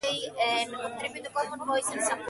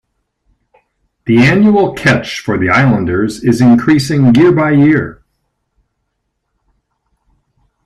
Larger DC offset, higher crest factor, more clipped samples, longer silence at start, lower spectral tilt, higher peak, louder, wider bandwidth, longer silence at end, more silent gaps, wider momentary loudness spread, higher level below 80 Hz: neither; about the same, 16 dB vs 12 dB; neither; second, 0 s vs 1.25 s; second, -1 dB/octave vs -7 dB/octave; second, -14 dBFS vs 0 dBFS; second, -30 LUFS vs -10 LUFS; about the same, 12 kHz vs 13 kHz; second, 0 s vs 2.75 s; neither; about the same, 7 LU vs 7 LU; second, -72 dBFS vs -44 dBFS